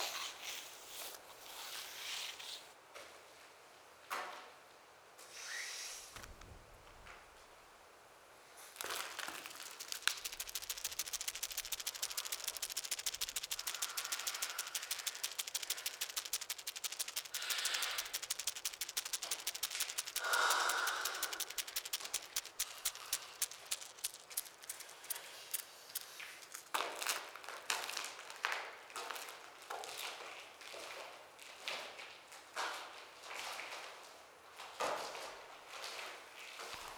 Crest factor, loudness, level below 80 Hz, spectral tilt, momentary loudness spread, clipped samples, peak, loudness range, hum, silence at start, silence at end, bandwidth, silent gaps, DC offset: 34 dB; -41 LUFS; -74 dBFS; 2 dB/octave; 17 LU; under 0.1%; -12 dBFS; 11 LU; none; 0 s; 0 s; over 20 kHz; none; under 0.1%